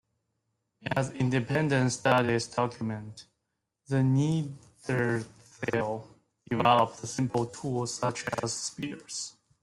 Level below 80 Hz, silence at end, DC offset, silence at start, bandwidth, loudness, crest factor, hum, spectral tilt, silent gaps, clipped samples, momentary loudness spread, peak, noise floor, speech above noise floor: -64 dBFS; 0.35 s; under 0.1%; 0.85 s; 12 kHz; -29 LUFS; 22 dB; none; -5.5 dB/octave; none; under 0.1%; 14 LU; -8 dBFS; -83 dBFS; 54 dB